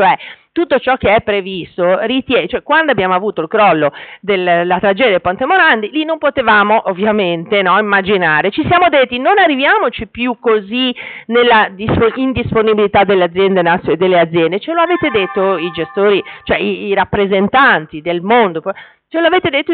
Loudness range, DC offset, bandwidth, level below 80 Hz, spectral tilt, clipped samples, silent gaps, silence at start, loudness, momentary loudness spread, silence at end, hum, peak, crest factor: 2 LU; under 0.1%; 4.6 kHz; -44 dBFS; -2.5 dB/octave; under 0.1%; none; 0 s; -12 LUFS; 8 LU; 0 s; none; -2 dBFS; 10 dB